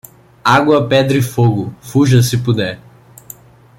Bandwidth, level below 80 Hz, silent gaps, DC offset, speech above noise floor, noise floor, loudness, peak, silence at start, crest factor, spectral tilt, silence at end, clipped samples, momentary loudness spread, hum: 17 kHz; -48 dBFS; none; under 0.1%; 27 dB; -39 dBFS; -13 LUFS; 0 dBFS; 0.45 s; 14 dB; -6 dB/octave; 1 s; under 0.1%; 9 LU; none